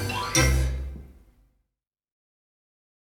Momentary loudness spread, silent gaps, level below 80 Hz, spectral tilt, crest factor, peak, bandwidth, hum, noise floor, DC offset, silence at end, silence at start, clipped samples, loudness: 19 LU; none; -32 dBFS; -3.5 dB/octave; 22 dB; -8 dBFS; 17 kHz; none; -85 dBFS; under 0.1%; 2 s; 0 s; under 0.1%; -24 LUFS